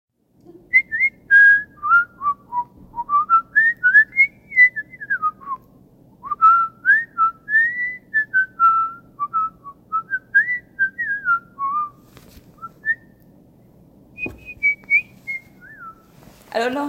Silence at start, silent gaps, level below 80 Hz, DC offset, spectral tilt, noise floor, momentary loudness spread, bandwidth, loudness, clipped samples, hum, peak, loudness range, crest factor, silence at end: 0.75 s; none; -58 dBFS; under 0.1%; -4 dB/octave; -50 dBFS; 17 LU; 15.5 kHz; -17 LUFS; under 0.1%; none; -4 dBFS; 9 LU; 16 dB; 0 s